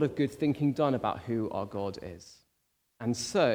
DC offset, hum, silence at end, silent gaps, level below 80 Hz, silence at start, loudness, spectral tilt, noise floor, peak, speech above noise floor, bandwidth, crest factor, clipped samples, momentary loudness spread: under 0.1%; none; 0 s; none; -64 dBFS; 0 s; -31 LUFS; -6 dB/octave; -76 dBFS; -14 dBFS; 46 dB; over 20 kHz; 18 dB; under 0.1%; 12 LU